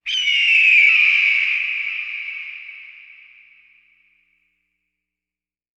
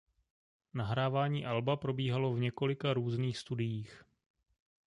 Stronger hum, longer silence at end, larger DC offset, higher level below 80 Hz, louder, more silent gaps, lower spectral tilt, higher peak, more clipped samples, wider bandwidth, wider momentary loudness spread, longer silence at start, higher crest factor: first, 60 Hz at -80 dBFS vs none; first, 2.8 s vs 0.9 s; neither; about the same, -68 dBFS vs -66 dBFS; first, -14 LUFS vs -35 LUFS; neither; second, 4.5 dB/octave vs -7 dB/octave; first, -2 dBFS vs -18 dBFS; neither; second, 8.6 kHz vs 10.5 kHz; first, 21 LU vs 7 LU; second, 0.05 s vs 0.75 s; about the same, 18 dB vs 18 dB